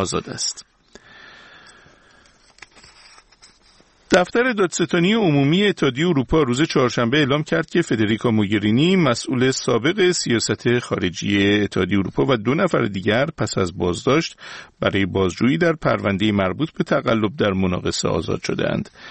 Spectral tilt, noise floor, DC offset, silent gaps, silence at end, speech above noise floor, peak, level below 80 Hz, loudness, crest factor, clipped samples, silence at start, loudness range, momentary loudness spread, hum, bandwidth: -5 dB/octave; -54 dBFS; under 0.1%; none; 0 s; 35 dB; 0 dBFS; -46 dBFS; -19 LUFS; 20 dB; under 0.1%; 0 s; 4 LU; 6 LU; none; 8.8 kHz